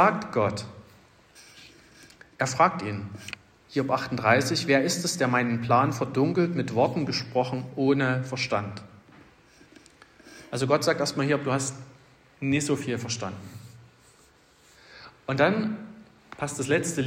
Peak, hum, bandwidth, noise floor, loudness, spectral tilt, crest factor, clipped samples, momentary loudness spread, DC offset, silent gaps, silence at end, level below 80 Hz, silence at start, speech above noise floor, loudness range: -6 dBFS; none; 16 kHz; -58 dBFS; -26 LUFS; -5 dB/octave; 20 dB; under 0.1%; 17 LU; under 0.1%; none; 0 s; -64 dBFS; 0 s; 33 dB; 7 LU